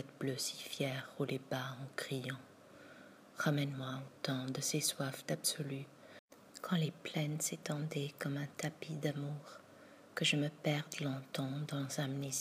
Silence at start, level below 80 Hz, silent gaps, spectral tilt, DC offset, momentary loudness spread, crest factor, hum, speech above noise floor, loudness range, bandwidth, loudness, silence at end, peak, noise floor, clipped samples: 0 s; -84 dBFS; 6.19-6.28 s; -4 dB/octave; under 0.1%; 21 LU; 20 dB; none; 20 dB; 3 LU; 15.5 kHz; -39 LUFS; 0 s; -20 dBFS; -59 dBFS; under 0.1%